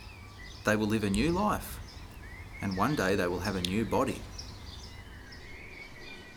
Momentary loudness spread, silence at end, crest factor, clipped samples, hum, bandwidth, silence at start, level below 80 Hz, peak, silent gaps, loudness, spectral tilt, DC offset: 18 LU; 0 s; 24 dB; under 0.1%; none; over 20 kHz; 0 s; -48 dBFS; -10 dBFS; none; -30 LUFS; -5.5 dB/octave; under 0.1%